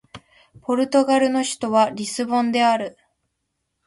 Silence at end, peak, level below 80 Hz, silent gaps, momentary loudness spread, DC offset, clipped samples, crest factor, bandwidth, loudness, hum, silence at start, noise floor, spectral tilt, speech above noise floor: 1 s; -6 dBFS; -64 dBFS; none; 8 LU; under 0.1%; under 0.1%; 16 dB; 11.5 kHz; -20 LUFS; none; 0.15 s; -76 dBFS; -3.5 dB/octave; 56 dB